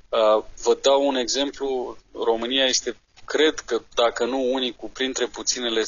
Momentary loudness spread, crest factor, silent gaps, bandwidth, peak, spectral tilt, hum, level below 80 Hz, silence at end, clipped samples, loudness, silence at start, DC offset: 9 LU; 16 dB; none; 7.6 kHz; -8 dBFS; -1 dB/octave; none; -52 dBFS; 0 s; under 0.1%; -22 LUFS; 0.1 s; 0.2%